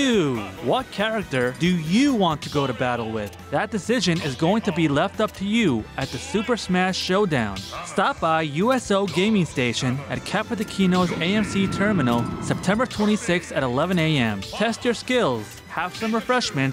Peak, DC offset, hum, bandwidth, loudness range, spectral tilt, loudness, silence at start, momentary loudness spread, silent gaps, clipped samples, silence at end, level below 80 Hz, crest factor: -10 dBFS; under 0.1%; none; 16 kHz; 1 LU; -5.5 dB/octave; -23 LUFS; 0 s; 6 LU; none; under 0.1%; 0 s; -48 dBFS; 12 dB